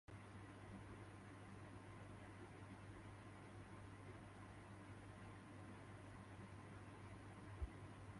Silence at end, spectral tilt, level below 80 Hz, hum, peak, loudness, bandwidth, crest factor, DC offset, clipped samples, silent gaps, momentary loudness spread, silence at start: 0 s; -6.5 dB/octave; -66 dBFS; none; -38 dBFS; -59 LUFS; 11.5 kHz; 20 dB; under 0.1%; under 0.1%; none; 2 LU; 0.1 s